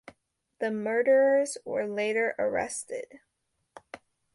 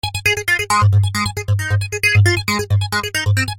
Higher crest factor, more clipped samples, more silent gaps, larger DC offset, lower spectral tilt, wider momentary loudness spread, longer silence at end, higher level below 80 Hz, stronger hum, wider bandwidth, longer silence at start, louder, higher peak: about the same, 16 dB vs 14 dB; neither; neither; neither; about the same, -3.5 dB/octave vs -4 dB/octave; first, 25 LU vs 6 LU; first, 0.4 s vs 0 s; second, -72 dBFS vs -40 dBFS; neither; second, 11.5 kHz vs 16.5 kHz; first, 0.6 s vs 0.05 s; second, -27 LUFS vs -16 LUFS; second, -14 dBFS vs -2 dBFS